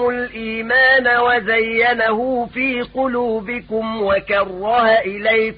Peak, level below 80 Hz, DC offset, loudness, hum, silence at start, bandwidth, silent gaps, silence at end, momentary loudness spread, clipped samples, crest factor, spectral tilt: -4 dBFS; -48 dBFS; under 0.1%; -17 LUFS; none; 0 s; 5.2 kHz; none; 0 s; 11 LU; under 0.1%; 14 dB; -9.5 dB/octave